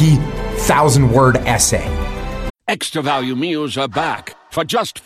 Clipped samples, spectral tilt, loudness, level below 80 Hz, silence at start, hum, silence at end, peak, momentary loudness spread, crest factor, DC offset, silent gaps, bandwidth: under 0.1%; -4.5 dB/octave; -16 LUFS; -28 dBFS; 0 s; none; 0.05 s; -2 dBFS; 13 LU; 14 dB; under 0.1%; 2.50-2.54 s; 15.5 kHz